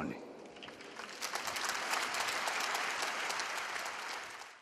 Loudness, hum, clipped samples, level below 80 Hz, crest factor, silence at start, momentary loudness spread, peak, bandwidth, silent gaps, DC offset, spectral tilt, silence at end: -37 LUFS; none; under 0.1%; -76 dBFS; 22 dB; 0 s; 13 LU; -16 dBFS; 15.5 kHz; none; under 0.1%; -0.5 dB/octave; 0 s